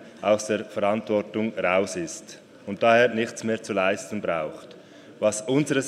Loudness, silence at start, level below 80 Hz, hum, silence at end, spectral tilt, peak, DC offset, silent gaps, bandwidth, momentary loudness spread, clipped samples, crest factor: -25 LUFS; 0 s; -70 dBFS; none; 0 s; -4.5 dB/octave; -6 dBFS; under 0.1%; none; 13.5 kHz; 15 LU; under 0.1%; 20 dB